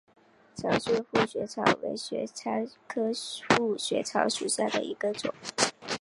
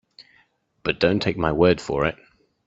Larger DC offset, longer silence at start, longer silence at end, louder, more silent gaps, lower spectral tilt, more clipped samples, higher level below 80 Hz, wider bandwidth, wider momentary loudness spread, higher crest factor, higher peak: neither; second, 0.55 s vs 0.85 s; second, 0.05 s vs 0.5 s; second, -29 LUFS vs -22 LUFS; neither; second, -3 dB/octave vs -6.5 dB/octave; neither; second, -66 dBFS vs -46 dBFS; first, 11.5 kHz vs 8 kHz; about the same, 8 LU vs 8 LU; about the same, 26 dB vs 22 dB; about the same, -4 dBFS vs -2 dBFS